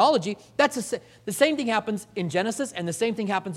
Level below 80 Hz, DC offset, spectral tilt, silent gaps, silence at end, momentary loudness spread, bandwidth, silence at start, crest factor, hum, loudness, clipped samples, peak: -68 dBFS; under 0.1%; -4 dB/octave; none; 0 s; 9 LU; 16 kHz; 0 s; 20 dB; none; -26 LUFS; under 0.1%; -4 dBFS